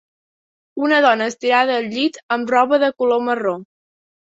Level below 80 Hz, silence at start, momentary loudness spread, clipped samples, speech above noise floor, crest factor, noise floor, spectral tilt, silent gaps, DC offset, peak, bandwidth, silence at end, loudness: -68 dBFS; 0.75 s; 9 LU; under 0.1%; over 73 dB; 18 dB; under -90 dBFS; -4 dB/octave; 2.23-2.29 s; under 0.1%; -2 dBFS; 8 kHz; 0.6 s; -17 LUFS